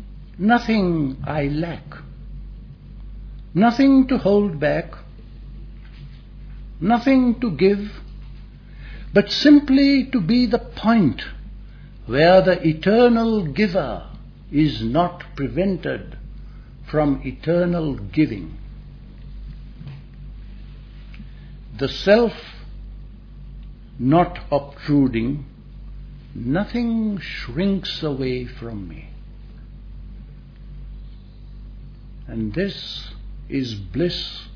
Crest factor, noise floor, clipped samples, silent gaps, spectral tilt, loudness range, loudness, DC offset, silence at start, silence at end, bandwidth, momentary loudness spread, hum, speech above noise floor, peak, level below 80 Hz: 20 dB; -39 dBFS; under 0.1%; none; -7.5 dB/octave; 14 LU; -20 LUFS; under 0.1%; 0 s; 0 s; 5.4 kHz; 25 LU; none; 20 dB; -2 dBFS; -38 dBFS